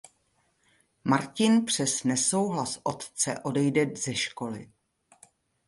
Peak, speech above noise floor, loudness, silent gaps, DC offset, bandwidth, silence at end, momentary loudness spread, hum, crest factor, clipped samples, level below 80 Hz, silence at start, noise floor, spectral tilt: -8 dBFS; 44 dB; -27 LUFS; none; under 0.1%; 11.5 kHz; 1 s; 10 LU; none; 22 dB; under 0.1%; -68 dBFS; 1.05 s; -71 dBFS; -4 dB/octave